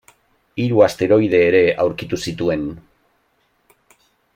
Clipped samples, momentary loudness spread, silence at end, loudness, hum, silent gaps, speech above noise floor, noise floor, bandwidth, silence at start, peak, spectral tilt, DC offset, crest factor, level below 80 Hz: under 0.1%; 11 LU; 1.55 s; -17 LUFS; none; none; 47 dB; -63 dBFS; 15.5 kHz; 0.55 s; -2 dBFS; -6 dB/octave; under 0.1%; 16 dB; -52 dBFS